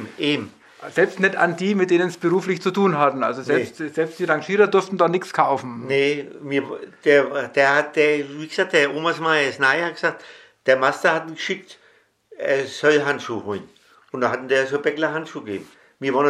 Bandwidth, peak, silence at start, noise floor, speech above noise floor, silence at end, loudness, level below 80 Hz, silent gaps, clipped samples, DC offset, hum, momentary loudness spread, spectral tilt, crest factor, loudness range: 12.5 kHz; -2 dBFS; 0 s; -57 dBFS; 37 dB; 0 s; -20 LUFS; -76 dBFS; none; under 0.1%; under 0.1%; none; 11 LU; -5 dB/octave; 20 dB; 4 LU